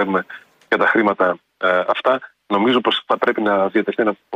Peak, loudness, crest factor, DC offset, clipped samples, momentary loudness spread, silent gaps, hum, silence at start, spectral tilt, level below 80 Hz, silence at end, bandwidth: -4 dBFS; -18 LUFS; 14 dB; under 0.1%; under 0.1%; 6 LU; none; none; 0 s; -6.5 dB/octave; -66 dBFS; 0 s; 9.2 kHz